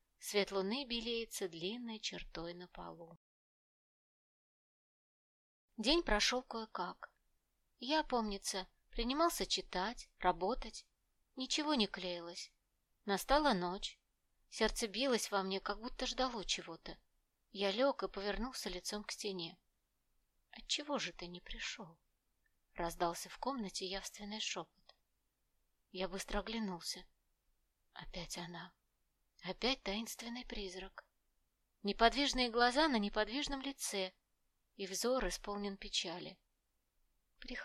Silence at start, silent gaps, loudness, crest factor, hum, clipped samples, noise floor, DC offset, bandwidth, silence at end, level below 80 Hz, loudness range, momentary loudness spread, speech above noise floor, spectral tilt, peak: 0.2 s; 3.17-5.68 s; -39 LUFS; 26 dB; none; under 0.1%; -83 dBFS; under 0.1%; 15.5 kHz; 0 s; -56 dBFS; 9 LU; 17 LU; 44 dB; -3 dB/octave; -14 dBFS